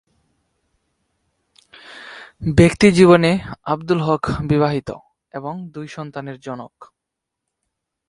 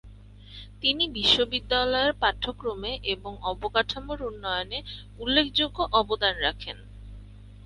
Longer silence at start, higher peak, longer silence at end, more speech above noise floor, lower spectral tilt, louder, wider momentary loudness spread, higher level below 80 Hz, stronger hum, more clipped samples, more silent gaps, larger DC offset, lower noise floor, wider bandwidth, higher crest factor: first, 1.9 s vs 0.05 s; first, 0 dBFS vs -6 dBFS; first, 1.25 s vs 0 s; first, 64 dB vs 20 dB; first, -6.5 dB/octave vs -4 dB/octave; first, -16 LUFS vs -26 LUFS; first, 25 LU vs 19 LU; about the same, -42 dBFS vs -44 dBFS; neither; neither; neither; neither; first, -82 dBFS vs -47 dBFS; about the same, 11.5 kHz vs 11.5 kHz; about the same, 20 dB vs 22 dB